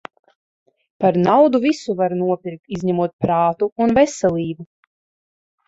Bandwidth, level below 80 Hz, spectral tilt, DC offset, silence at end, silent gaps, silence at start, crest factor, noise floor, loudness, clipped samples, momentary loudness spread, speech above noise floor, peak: 8 kHz; -54 dBFS; -6.5 dB/octave; under 0.1%; 1.05 s; 2.59-2.63 s, 3.13-3.19 s, 3.72-3.76 s; 1 s; 16 dB; under -90 dBFS; -18 LUFS; under 0.1%; 11 LU; over 73 dB; -4 dBFS